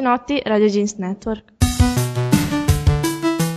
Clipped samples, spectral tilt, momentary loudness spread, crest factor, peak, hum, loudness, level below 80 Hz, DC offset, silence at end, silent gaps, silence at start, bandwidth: under 0.1%; -5.5 dB/octave; 8 LU; 16 dB; -2 dBFS; none; -19 LUFS; -28 dBFS; under 0.1%; 0 s; none; 0 s; 14 kHz